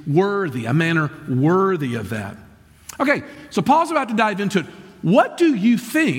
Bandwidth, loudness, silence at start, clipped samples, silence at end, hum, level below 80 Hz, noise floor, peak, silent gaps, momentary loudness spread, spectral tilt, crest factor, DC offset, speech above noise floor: 17 kHz; -19 LUFS; 0 s; under 0.1%; 0 s; none; -58 dBFS; -42 dBFS; -4 dBFS; none; 10 LU; -6.5 dB/octave; 16 dB; under 0.1%; 24 dB